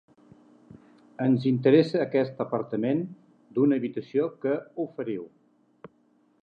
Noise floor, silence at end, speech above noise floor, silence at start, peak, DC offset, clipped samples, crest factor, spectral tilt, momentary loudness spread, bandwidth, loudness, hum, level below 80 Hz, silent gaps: -65 dBFS; 1.15 s; 40 dB; 0.75 s; -8 dBFS; under 0.1%; under 0.1%; 20 dB; -9 dB/octave; 13 LU; 6.4 kHz; -26 LUFS; none; -76 dBFS; none